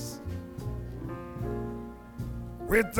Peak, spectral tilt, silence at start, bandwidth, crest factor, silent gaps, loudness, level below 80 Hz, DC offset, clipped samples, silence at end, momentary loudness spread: -12 dBFS; -6 dB/octave; 0 s; 19.5 kHz; 22 dB; none; -35 LUFS; -44 dBFS; under 0.1%; under 0.1%; 0 s; 11 LU